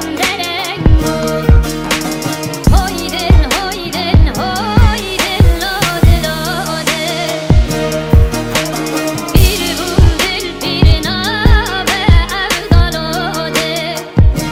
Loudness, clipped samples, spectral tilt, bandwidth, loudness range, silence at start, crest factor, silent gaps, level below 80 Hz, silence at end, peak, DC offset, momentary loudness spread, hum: -13 LUFS; 1%; -5 dB/octave; 16.5 kHz; 2 LU; 0 s; 12 dB; none; -16 dBFS; 0 s; 0 dBFS; under 0.1%; 6 LU; none